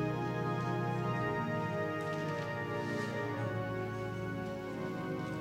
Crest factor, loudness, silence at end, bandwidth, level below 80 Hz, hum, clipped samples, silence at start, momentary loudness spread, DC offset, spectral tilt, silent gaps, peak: 14 dB; -37 LUFS; 0 s; 16 kHz; -62 dBFS; none; under 0.1%; 0 s; 4 LU; under 0.1%; -7 dB/octave; none; -22 dBFS